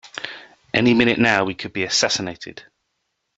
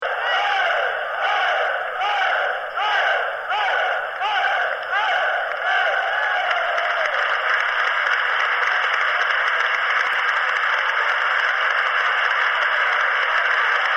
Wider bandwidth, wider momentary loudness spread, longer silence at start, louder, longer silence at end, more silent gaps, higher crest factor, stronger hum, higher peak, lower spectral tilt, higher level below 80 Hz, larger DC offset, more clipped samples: second, 8 kHz vs 15.5 kHz; first, 19 LU vs 4 LU; about the same, 0.05 s vs 0 s; about the same, -18 LUFS vs -19 LUFS; first, 0.75 s vs 0 s; neither; first, 20 dB vs 14 dB; neither; first, -2 dBFS vs -6 dBFS; first, -3.5 dB/octave vs 0.5 dB/octave; first, -56 dBFS vs -66 dBFS; neither; neither